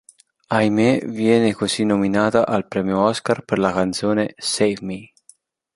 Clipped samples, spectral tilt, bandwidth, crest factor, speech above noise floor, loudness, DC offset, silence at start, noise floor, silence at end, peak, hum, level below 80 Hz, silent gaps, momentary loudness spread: under 0.1%; -5 dB/octave; 11.5 kHz; 18 dB; 35 dB; -19 LUFS; under 0.1%; 0.5 s; -54 dBFS; 0.7 s; -2 dBFS; none; -54 dBFS; none; 6 LU